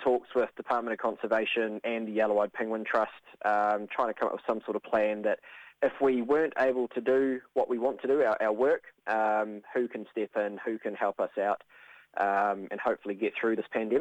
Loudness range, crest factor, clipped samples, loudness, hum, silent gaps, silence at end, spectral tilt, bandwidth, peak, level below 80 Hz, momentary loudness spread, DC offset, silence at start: 4 LU; 16 dB; under 0.1%; -30 LUFS; none; none; 0 s; -6.5 dB/octave; 9 kHz; -14 dBFS; -74 dBFS; 6 LU; under 0.1%; 0 s